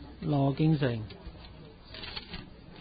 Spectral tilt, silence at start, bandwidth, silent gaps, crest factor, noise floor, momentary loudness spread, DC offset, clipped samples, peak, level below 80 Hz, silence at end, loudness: -11 dB/octave; 0 s; 5 kHz; none; 16 dB; -49 dBFS; 23 LU; under 0.1%; under 0.1%; -16 dBFS; -52 dBFS; 0 s; -30 LUFS